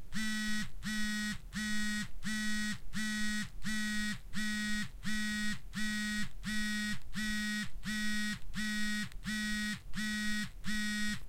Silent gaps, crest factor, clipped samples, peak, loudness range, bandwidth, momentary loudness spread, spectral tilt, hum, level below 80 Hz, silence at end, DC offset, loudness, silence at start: none; 12 dB; under 0.1%; -24 dBFS; 0 LU; 16 kHz; 4 LU; -2.5 dB/octave; none; -50 dBFS; 0 s; under 0.1%; -37 LUFS; 0 s